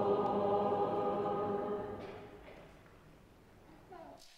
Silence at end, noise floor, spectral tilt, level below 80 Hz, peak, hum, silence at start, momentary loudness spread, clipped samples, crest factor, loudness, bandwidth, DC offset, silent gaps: 0.1 s; -60 dBFS; -7.5 dB/octave; -66 dBFS; -22 dBFS; none; 0 s; 22 LU; under 0.1%; 16 dB; -35 LUFS; 9.6 kHz; under 0.1%; none